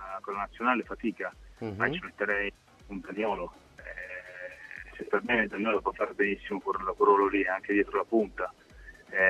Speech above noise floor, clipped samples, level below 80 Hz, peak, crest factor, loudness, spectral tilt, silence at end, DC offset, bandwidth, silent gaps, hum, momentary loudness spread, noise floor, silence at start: 22 dB; under 0.1%; -56 dBFS; -10 dBFS; 20 dB; -30 LUFS; -6.5 dB/octave; 0 s; under 0.1%; 9.2 kHz; none; none; 16 LU; -51 dBFS; 0 s